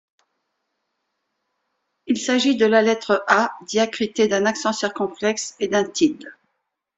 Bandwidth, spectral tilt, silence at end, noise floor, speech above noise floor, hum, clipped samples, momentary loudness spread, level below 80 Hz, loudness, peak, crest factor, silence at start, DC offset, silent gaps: 8.2 kHz; -3.5 dB/octave; 0.65 s; -76 dBFS; 56 dB; none; under 0.1%; 7 LU; -66 dBFS; -20 LUFS; 0 dBFS; 22 dB; 2.05 s; under 0.1%; none